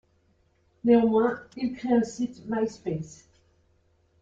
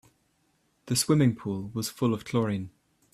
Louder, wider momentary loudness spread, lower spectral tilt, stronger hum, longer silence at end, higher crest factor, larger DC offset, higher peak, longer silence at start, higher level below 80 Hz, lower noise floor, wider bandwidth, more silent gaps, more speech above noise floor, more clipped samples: about the same, -26 LUFS vs -28 LUFS; first, 13 LU vs 10 LU; first, -7 dB/octave vs -5.5 dB/octave; neither; first, 1.1 s vs 0.45 s; about the same, 18 dB vs 18 dB; neither; about the same, -10 dBFS vs -10 dBFS; about the same, 0.85 s vs 0.85 s; about the same, -62 dBFS vs -64 dBFS; second, -66 dBFS vs -71 dBFS; second, 7.8 kHz vs 15.5 kHz; neither; about the same, 41 dB vs 44 dB; neither